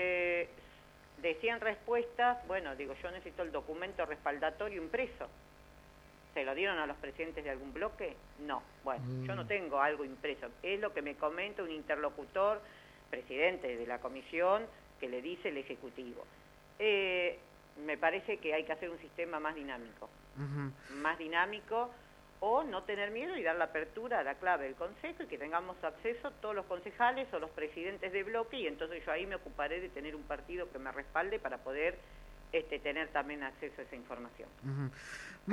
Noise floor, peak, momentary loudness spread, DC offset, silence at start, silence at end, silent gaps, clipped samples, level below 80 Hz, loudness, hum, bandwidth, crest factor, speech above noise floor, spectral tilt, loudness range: -59 dBFS; -16 dBFS; 13 LU; under 0.1%; 0 s; 0 s; none; under 0.1%; -62 dBFS; -38 LUFS; none; 14 kHz; 22 dB; 21 dB; -6 dB/octave; 4 LU